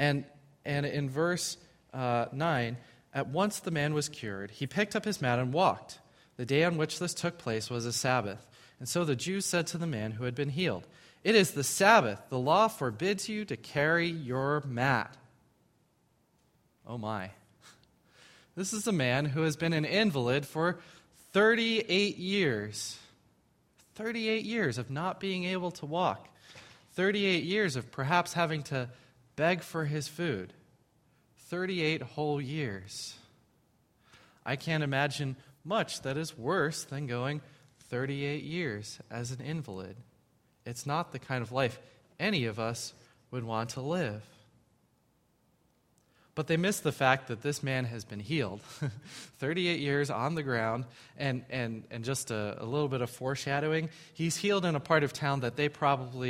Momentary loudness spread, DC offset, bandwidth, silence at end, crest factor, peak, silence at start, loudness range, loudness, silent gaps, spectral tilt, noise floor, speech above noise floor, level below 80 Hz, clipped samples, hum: 13 LU; under 0.1%; 16 kHz; 0 s; 24 dB; -8 dBFS; 0 s; 8 LU; -31 LUFS; none; -4.5 dB/octave; -71 dBFS; 40 dB; -68 dBFS; under 0.1%; none